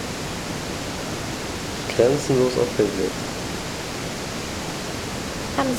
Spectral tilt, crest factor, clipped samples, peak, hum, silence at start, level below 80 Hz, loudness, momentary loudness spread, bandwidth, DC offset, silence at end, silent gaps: -4.5 dB/octave; 20 dB; under 0.1%; -4 dBFS; none; 0 s; -44 dBFS; -25 LUFS; 9 LU; 19 kHz; under 0.1%; 0 s; none